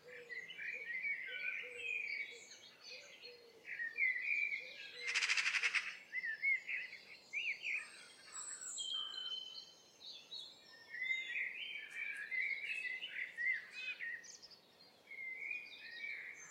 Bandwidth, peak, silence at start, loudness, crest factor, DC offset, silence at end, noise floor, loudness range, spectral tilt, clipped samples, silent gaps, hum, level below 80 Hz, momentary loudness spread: 16 kHz; -22 dBFS; 0 s; -41 LUFS; 22 dB; under 0.1%; 0 s; -66 dBFS; 6 LU; 2 dB/octave; under 0.1%; none; none; under -90 dBFS; 18 LU